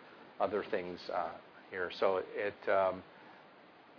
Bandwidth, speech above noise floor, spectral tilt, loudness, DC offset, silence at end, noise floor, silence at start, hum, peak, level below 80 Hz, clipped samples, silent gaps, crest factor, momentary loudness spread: 5.4 kHz; 24 dB; -2.5 dB/octave; -36 LUFS; under 0.1%; 0 s; -59 dBFS; 0 s; none; -18 dBFS; -78 dBFS; under 0.1%; none; 20 dB; 22 LU